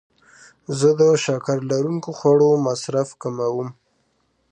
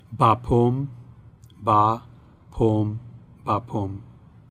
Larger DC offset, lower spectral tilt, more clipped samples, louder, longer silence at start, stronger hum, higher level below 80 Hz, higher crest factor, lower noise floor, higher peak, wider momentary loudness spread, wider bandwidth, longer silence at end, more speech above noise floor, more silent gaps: neither; second, -6 dB/octave vs -9 dB/octave; neither; first, -20 LUFS vs -23 LUFS; first, 0.7 s vs 0.1 s; neither; second, -68 dBFS vs -44 dBFS; about the same, 16 dB vs 20 dB; first, -67 dBFS vs -48 dBFS; about the same, -4 dBFS vs -4 dBFS; second, 13 LU vs 16 LU; about the same, 9.4 kHz vs 9.8 kHz; first, 0.8 s vs 0.4 s; first, 48 dB vs 27 dB; neither